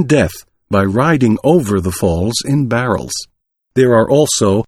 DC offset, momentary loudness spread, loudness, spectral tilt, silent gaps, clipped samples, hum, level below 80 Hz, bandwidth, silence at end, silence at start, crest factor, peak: under 0.1%; 8 LU; -14 LUFS; -5.5 dB/octave; none; under 0.1%; none; -38 dBFS; 16.5 kHz; 0.05 s; 0 s; 14 dB; 0 dBFS